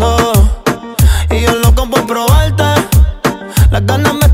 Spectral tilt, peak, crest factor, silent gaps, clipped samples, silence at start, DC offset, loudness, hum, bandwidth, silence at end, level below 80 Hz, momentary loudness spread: -5.5 dB/octave; 0 dBFS; 10 dB; none; under 0.1%; 0 s; under 0.1%; -11 LUFS; none; 16.5 kHz; 0 s; -14 dBFS; 4 LU